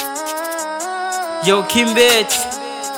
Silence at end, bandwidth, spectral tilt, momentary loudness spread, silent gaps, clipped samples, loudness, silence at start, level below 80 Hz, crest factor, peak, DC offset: 0 s; over 20 kHz; -2 dB/octave; 11 LU; none; under 0.1%; -16 LUFS; 0 s; -54 dBFS; 16 dB; 0 dBFS; under 0.1%